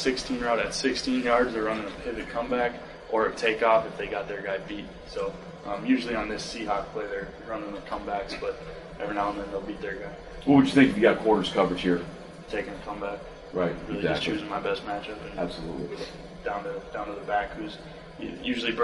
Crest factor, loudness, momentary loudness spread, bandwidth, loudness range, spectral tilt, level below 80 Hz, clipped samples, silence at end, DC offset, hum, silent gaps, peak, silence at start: 22 dB; -28 LUFS; 15 LU; 11.5 kHz; 9 LU; -5 dB/octave; -50 dBFS; under 0.1%; 0 s; under 0.1%; none; none; -6 dBFS; 0 s